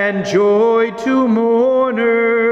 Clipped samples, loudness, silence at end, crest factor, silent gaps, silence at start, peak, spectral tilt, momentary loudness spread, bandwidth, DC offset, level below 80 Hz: under 0.1%; -14 LUFS; 0 s; 10 dB; none; 0 s; -4 dBFS; -6 dB/octave; 3 LU; 8 kHz; under 0.1%; -56 dBFS